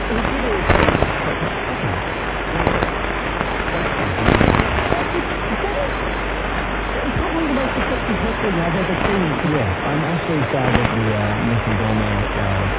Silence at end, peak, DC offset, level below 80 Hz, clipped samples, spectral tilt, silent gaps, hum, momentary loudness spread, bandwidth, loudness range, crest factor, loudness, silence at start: 0 s; 0 dBFS; under 0.1%; -28 dBFS; under 0.1%; -10 dB/octave; none; none; 6 LU; 4 kHz; 2 LU; 18 dB; -19 LUFS; 0 s